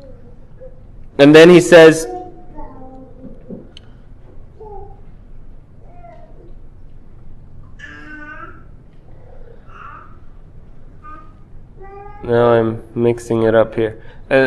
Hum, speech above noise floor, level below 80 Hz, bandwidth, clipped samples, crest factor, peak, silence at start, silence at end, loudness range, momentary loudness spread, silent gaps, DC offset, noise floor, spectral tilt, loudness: none; 28 dB; -40 dBFS; 12.5 kHz; 0.3%; 16 dB; 0 dBFS; 0.65 s; 0 s; 27 LU; 31 LU; none; under 0.1%; -38 dBFS; -5.5 dB/octave; -11 LUFS